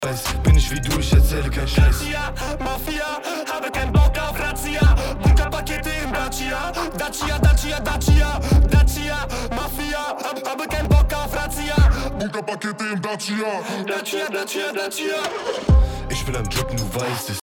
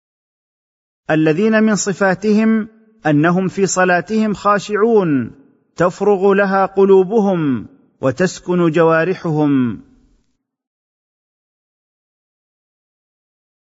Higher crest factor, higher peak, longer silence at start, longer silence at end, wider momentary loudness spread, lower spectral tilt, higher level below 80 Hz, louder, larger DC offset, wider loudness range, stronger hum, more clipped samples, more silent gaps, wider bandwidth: about the same, 16 dB vs 14 dB; about the same, -4 dBFS vs -2 dBFS; second, 0 s vs 1.1 s; second, 0.05 s vs 4 s; about the same, 8 LU vs 8 LU; about the same, -5 dB/octave vs -6 dB/octave; first, -22 dBFS vs -56 dBFS; second, -21 LUFS vs -15 LUFS; neither; about the same, 3 LU vs 4 LU; neither; neither; neither; first, 18.5 kHz vs 8 kHz